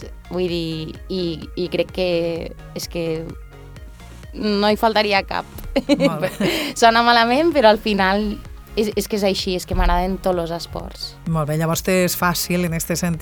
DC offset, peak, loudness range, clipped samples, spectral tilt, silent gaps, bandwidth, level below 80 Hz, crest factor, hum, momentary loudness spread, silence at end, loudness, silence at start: under 0.1%; 0 dBFS; 8 LU; under 0.1%; -4.5 dB/octave; none; over 20 kHz; -34 dBFS; 20 dB; none; 15 LU; 0 s; -19 LUFS; 0 s